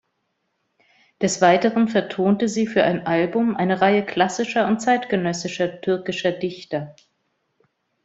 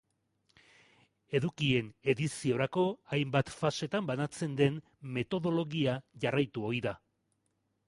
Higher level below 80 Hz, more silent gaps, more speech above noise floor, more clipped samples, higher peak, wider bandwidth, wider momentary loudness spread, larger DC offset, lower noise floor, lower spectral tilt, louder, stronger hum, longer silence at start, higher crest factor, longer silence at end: about the same, -62 dBFS vs -66 dBFS; neither; first, 53 dB vs 47 dB; neither; first, -2 dBFS vs -12 dBFS; second, 8.2 kHz vs 11.5 kHz; first, 8 LU vs 5 LU; neither; second, -73 dBFS vs -79 dBFS; about the same, -5 dB/octave vs -6 dB/octave; first, -21 LUFS vs -33 LUFS; neither; about the same, 1.2 s vs 1.3 s; about the same, 20 dB vs 20 dB; first, 1.15 s vs 0.9 s